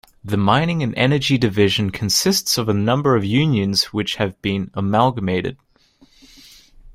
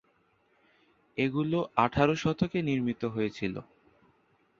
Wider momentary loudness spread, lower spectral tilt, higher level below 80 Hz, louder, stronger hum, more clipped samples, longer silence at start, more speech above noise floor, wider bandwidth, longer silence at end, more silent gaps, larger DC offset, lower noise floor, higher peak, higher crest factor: second, 6 LU vs 10 LU; second, -4.5 dB/octave vs -7 dB/octave; first, -48 dBFS vs -58 dBFS; first, -18 LUFS vs -30 LUFS; neither; neither; second, 0.25 s vs 1.15 s; second, 36 dB vs 41 dB; first, 16 kHz vs 7.4 kHz; second, 0.05 s vs 0.95 s; neither; neither; second, -54 dBFS vs -69 dBFS; first, -2 dBFS vs -8 dBFS; about the same, 18 dB vs 22 dB